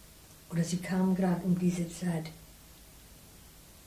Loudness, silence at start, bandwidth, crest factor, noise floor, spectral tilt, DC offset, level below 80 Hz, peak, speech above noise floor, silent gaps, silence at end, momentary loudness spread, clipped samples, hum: -31 LUFS; 0 s; 15.5 kHz; 14 dB; -54 dBFS; -6.5 dB/octave; under 0.1%; -58 dBFS; -18 dBFS; 24 dB; none; 0.05 s; 24 LU; under 0.1%; none